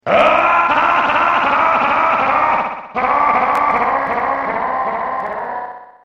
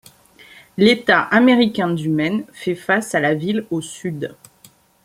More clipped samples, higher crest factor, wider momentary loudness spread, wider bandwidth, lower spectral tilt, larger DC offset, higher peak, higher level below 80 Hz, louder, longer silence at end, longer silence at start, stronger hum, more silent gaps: neither; about the same, 16 dB vs 18 dB; second, 10 LU vs 14 LU; second, 10.5 kHz vs 15.5 kHz; about the same, -5 dB/octave vs -5.5 dB/octave; neither; about the same, 0 dBFS vs 0 dBFS; first, -48 dBFS vs -58 dBFS; first, -15 LUFS vs -18 LUFS; second, 0.2 s vs 0.7 s; second, 0.05 s vs 0.75 s; neither; neither